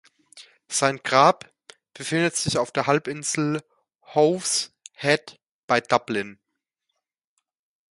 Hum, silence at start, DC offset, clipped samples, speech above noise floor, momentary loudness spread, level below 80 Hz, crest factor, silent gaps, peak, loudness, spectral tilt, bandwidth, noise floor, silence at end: none; 0.35 s; under 0.1%; under 0.1%; 58 dB; 11 LU; -64 dBFS; 22 dB; 3.95-3.99 s, 5.47-5.68 s; -2 dBFS; -23 LUFS; -3.5 dB/octave; 11.5 kHz; -81 dBFS; 1.6 s